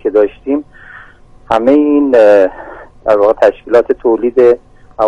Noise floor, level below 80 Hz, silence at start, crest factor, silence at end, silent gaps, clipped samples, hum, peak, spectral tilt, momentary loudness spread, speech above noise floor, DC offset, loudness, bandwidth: -38 dBFS; -42 dBFS; 0.05 s; 12 dB; 0 s; none; 0.1%; none; 0 dBFS; -6.5 dB/octave; 11 LU; 29 dB; under 0.1%; -11 LUFS; 8.2 kHz